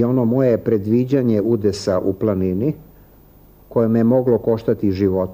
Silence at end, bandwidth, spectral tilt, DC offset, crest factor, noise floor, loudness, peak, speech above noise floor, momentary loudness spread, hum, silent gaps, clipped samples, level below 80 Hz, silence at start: 0 s; 15.5 kHz; -8.5 dB/octave; under 0.1%; 12 dB; -47 dBFS; -18 LUFS; -4 dBFS; 30 dB; 5 LU; none; none; under 0.1%; -50 dBFS; 0 s